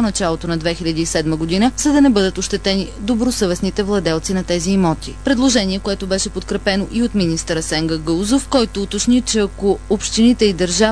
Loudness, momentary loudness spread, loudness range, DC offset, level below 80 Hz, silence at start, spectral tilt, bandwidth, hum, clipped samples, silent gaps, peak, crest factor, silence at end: -17 LUFS; 6 LU; 2 LU; 0.6%; -32 dBFS; 0 s; -4.5 dB/octave; 11 kHz; none; under 0.1%; none; 0 dBFS; 16 dB; 0 s